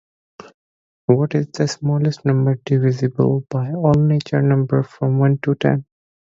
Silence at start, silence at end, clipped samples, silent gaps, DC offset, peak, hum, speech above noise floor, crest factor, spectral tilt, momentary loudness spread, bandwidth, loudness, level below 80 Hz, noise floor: 1.1 s; 0.4 s; under 0.1%; none; under 0.1%; 0 dBFS; none; over 73 dB; 18 dB; -8 dB/octave; 4 LU; 7.6 kHz; -18 LUFS; -52 dBFS; under -90 dBFS